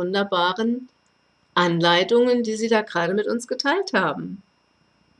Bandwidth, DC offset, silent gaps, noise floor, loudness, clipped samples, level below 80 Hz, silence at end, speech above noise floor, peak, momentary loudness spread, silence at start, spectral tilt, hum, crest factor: 11 kHz; under 0.1%; none; -64 dBFS; -21 LUFS; under 0.1%; -70 dBFS; 0.8 s; 43 dB; -6 dBFS; 9 LU; 0 s; -4.5 dB/octave; 60 Hz at -55 dBFS; 16 dB